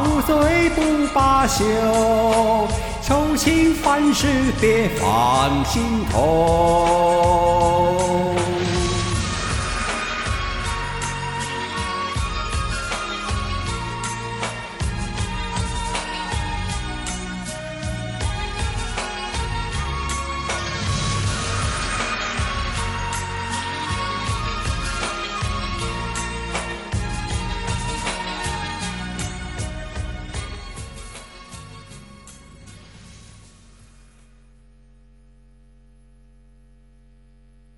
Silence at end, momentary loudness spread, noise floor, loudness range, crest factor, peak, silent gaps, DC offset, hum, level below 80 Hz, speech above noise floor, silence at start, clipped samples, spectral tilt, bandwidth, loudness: 3.9 s; 12 LU; -51 dBFS; 11 LU; 18 dB; -4 dBFS; none; under 0.1%; none; -32 dBFS; 33 dB; 0 s; under 0.1%; -4.5 dB/octave; 16.5 kHz; -22 LUFS